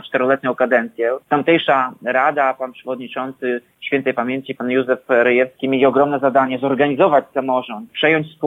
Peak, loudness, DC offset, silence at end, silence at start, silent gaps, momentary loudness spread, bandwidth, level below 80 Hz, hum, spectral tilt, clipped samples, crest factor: -2 dBFS; -17 LUFS; under 0.1%; 0 s; 0.05 s; none; 9 LU; 4 kHz; -64 dBFS; none; -7.5 dB/octave; under 0.1%; 16 dB